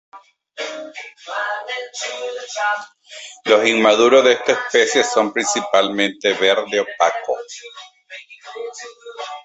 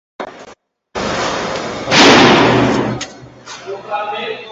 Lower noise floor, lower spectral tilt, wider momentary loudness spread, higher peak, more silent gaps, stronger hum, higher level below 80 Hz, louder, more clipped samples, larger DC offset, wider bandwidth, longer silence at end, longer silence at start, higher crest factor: second, -40 dBFS vs -44 dBFS; second, -2 dB/octave vs -4 dB/octave; about the same, 22 LU vs 23 LU; about the same, 0 dBFS vs 0 dBFS; neither; neither; second, -66 dBFS vs -42 dBFS; second, -17 LUFS vs -12 LUFS; neither; neither; second, 8.2 kHz vs 10.5 kHz; about the same, 0.05 s vs 0 s; about the same, 0.15 s vs 0.2 s; about the same, 18 dB vs 14 dB